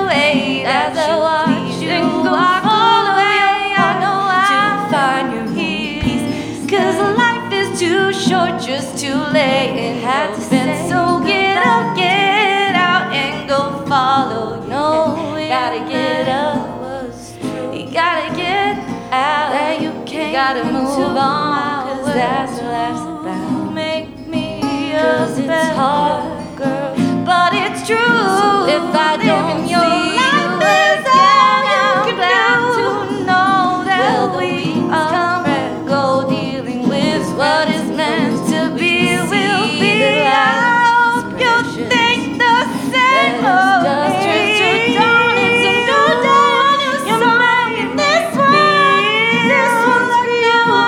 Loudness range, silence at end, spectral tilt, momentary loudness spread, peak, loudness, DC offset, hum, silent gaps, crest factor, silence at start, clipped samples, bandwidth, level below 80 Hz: 6 LU; 0 s; -4.5 dB/octave; 9 LU; 0 dBFS; -14 LUFS; under 0.1%; none; none; 14 dB; 0 s; under 0.1%; 17 kHz; -48 dBFS